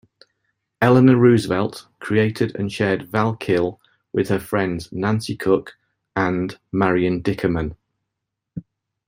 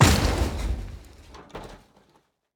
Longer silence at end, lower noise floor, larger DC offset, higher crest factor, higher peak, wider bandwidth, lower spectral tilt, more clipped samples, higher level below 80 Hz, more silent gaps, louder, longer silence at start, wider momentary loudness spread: second, 0.45 s vs 0.8 s; first, -81 dBFS vs -64 dBFS; neither; about the same, 18 dB vs 22 dB; about the same, -2 dBFS vs -4 dBFS; second, 16 kHz vs over 20 kHz; first, -7.5 dB/octave vs -4.5 dB/octave; neither; second, -50 dBFS vs -32 dBFS; neither; first, -20 LUFS vs -25 LUFS; first, 0.8 s vs 0 s; second, 13 LU vs 24 LU